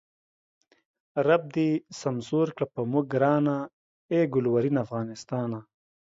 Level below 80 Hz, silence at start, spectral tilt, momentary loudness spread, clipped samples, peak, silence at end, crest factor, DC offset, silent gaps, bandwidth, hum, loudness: -70 dBFS; 1.15 s; -7.5 dB/octave; 10 LU; under 0.1%; -8 dBFS; 0.4 s; 20 dB; under 0.1%; 3.73-4.09 s; 7.8 kHz; none; -27 LUFS